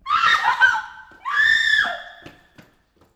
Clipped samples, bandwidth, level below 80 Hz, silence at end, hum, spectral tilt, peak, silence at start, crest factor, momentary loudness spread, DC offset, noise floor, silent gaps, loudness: under 0.1%; 16 kHz; -56 dBFS; 0.85 s; none; 0 dB/octave; -4 dBFS; 0.05 s; 18 dB; 18 LU; under 0.1%; -58 dBFS; none; -17 LUFS